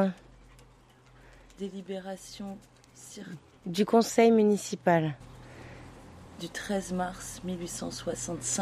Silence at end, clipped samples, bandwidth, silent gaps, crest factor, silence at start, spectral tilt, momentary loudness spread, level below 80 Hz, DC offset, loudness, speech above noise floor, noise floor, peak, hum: 0 s; under 0.1%; 15.5 kHz; none; 22 dB; 0 s; -5 dB/octave; 25 LU; -58 dBFS; under 0.1%; -29 LUFS; 29 dB; -58 dBFS; -10 dBFS; none